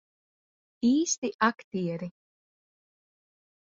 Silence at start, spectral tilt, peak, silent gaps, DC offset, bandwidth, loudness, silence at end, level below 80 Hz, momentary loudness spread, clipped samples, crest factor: 0.8 s; -4 dB/octave; -10 dBFS; 1.18-1.22 s, 1.34-1.39 s, 1.64-1.71 s; under 0.1%; 7.8 kHz; -28 LUFS; 1.55 s; -74 dBFS; 11 LU; under 0.1%; 22 dB